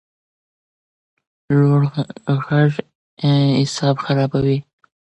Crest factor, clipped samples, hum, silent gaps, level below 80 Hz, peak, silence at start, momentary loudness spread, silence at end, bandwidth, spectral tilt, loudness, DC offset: 16 dB; under 0.1%; none; 2.95-3.17 s; -52 dBFS; -4 dBFS; 1.5 s; 7 LU; 0.45 s; 8.6 kHz; -7 dB/octave; -18 LUFS; under 0.1%